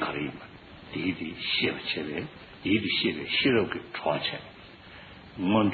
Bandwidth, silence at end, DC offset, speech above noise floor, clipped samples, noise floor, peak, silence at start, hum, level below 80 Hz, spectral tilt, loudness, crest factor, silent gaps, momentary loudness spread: 4.8 kHz; 0 s; under 0.1%; 20 dB; under 0.1%; -48 dBFS; -12 dBFS; 0 s; none; -60 dBFS; -3 dB/octave; -28 LUFS; 18 dB; none; 22 LU